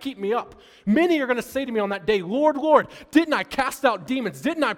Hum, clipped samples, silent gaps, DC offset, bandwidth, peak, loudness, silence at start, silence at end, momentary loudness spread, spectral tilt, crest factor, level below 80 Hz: none; under 0.1%; none; under 0.1%; 18 kHz; -2 dBFS; -22 LUFS; 0 s; 0 s; 7 LU; -5 dB/octave; 20 dB; -56 dBFS